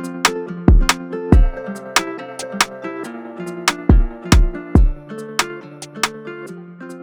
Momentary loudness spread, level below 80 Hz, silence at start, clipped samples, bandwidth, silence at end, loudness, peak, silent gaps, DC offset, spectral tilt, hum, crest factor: 16 LU; -20 dBFS; 0 s; under 0.1%; over 20 kHz; 0 s; -18 LUFS; 0 dBFS; none; under 0.1%; -4.5 dB/octave; none; 18 dB